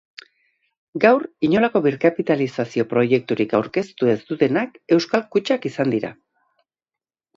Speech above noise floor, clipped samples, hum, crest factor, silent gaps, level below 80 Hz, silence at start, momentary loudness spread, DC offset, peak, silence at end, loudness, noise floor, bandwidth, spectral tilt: 71 dB; under 0.1%; none; 20 dB; none; -64 dBFS; 0.95 s; 6 LU; under 0.1%; 0 dBFS; 1.25 s; -20 LUFS; -90 dBFS; 7.8 kHz; -7 dB/octave